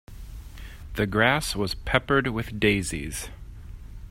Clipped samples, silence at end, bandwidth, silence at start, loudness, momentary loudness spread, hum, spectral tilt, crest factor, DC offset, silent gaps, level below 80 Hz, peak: under 0.1%; 0 s; 16 kHz; 0.1 s; -25 LUFS; 22 LU; none; -4.5 dB/octave; 24 dB; under 0.1%; none; -40 dBFS; -4 dBFS